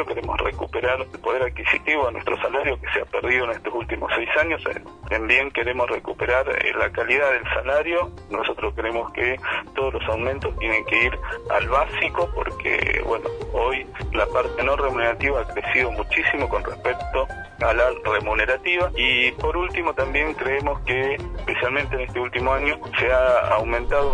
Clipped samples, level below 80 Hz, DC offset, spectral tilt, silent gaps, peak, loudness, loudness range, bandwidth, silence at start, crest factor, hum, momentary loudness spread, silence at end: under 0.1%; -36 dBFS; under 0.1%; -5.5 dB/octave; none; -4 dBFS; -22 LUFS; 2 LU; 10.5 kHz; 0 s; 18 dB; none; 7 LU; 0 s